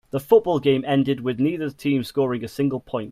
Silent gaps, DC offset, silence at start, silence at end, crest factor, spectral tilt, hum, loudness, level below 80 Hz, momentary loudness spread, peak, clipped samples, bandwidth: none; under 0.1%; 0.15 s; 0 s; 18 dB; -7.5 dB/octave; none; -22 LUFS; -58 dBFS; 7 LU; -4 dBFS; under 0.1%; 15.5 kHz